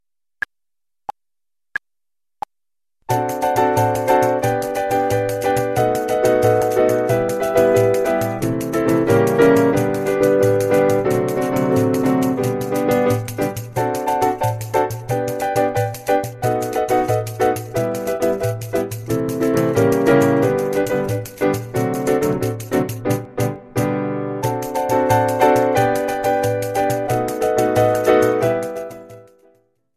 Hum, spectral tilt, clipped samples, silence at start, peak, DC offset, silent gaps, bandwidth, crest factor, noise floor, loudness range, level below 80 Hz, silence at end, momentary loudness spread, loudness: none; -6 dB/octave; under 0.1%; 1.1 s; 0 dBFS; under 0.1%; none; 14 kHz; 18 dB; under -90 dBFS; 5 LU; -48 dBFS; 0.75 s; 8 LU; -18 LUFS